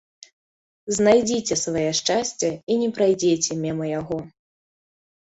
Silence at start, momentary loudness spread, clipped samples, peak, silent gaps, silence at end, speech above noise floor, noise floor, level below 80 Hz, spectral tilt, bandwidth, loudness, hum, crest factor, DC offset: 0.85 s; 10 LU; under 0.1%; -4 dBFS; 2.63-2.67 s; 1.1 s; over 68 dB; under -90 dBFS; -58 dBFS; -4 dB/octave; 8.4 kHz; -22 LUFS; none; 20 dB; under 0.1%